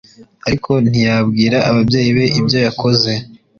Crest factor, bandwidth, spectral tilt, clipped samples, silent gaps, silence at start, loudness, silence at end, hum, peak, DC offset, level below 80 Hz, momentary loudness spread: 12 dB; 7.2 kHz; -6 dB/octave; under 0.1%; none; 0.2 s; -14 LUFS; 0.25 s; none; -2 dBFS; under 0.1%; -42 dBFS; 7 LU